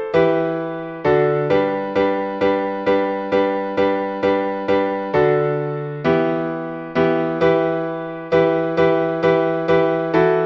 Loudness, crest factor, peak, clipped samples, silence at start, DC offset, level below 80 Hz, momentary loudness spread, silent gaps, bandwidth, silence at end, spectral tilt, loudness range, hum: -19 LUFS; 14 dB; -4 dBFS; under 0.1%; 0 s; under 0.1%; -52 dBFS; 6 LU; none; 6.6 kHz; 0 s; -8 dB/octave; 2 LU; none